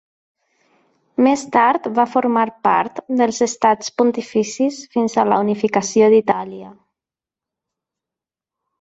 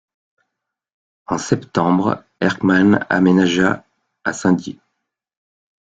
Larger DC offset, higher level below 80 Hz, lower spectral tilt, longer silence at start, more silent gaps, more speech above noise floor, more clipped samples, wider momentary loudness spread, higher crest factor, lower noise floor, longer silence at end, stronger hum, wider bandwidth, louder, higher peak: neither; second, -64 dBFS vs -54 dBFS; second, -4.5 dB/octave vs -6 dB/octave; about the same, 1.2 s vs 1.3 s; neither; first, 72 dB vs 63 dB; neither; second, 7 LU vs 12 LU; about the same, 18 dB vs 18 dB; first, -88 dBFS vs -79 dBFS; first, 2.1 s vs 1.2 s; neither; about the same, 8.2 kHz vs 7.8 kHz; about the same, -17 LUFS vs -17 LUFS; about the same, 0 dBFS vs -2 dBFS